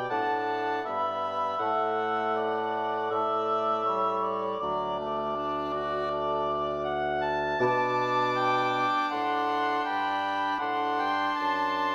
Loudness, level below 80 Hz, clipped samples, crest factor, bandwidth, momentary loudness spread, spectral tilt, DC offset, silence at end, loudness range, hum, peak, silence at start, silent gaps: -28 LUFS; -62 dBFS; under 0.1%; 14 dB; 15 kHz; 4 LU; -5.5 dB/octave; under 0.1%; 0 s; 2 LU; none; -14 dBFS; 0 s; none